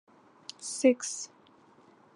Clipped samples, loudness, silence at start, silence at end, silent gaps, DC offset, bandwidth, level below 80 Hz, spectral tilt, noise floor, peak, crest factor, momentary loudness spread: under 0.1%; -29 LUFS; 0.6 s; 0.9 s; none; under 0.1%; 11.5 kHz; under -90 dBFS; -2 dB/octave; -60 dBFS; -10 dBFS; 22 dB; 21 LU